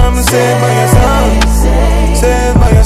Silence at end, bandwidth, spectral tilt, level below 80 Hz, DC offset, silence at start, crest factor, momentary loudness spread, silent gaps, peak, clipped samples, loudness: 0 s; 15.5 kHz; -5.5 dB/octave; -10 dBFS; under 0.1%; 0 s; 8 dB; 2 LU; none; 0 dBFS; 2%; -10 LUFS